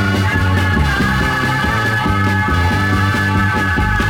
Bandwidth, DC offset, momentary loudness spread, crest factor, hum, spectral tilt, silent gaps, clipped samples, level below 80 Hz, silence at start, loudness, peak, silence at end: 17 kHz; under 0.1%; 1 LU; 12 dB; none; -5.5 dB/octave; none; under 0.1%; -26 dBFS; 0 s; -15 LUFS; -2 dBFS; 0 s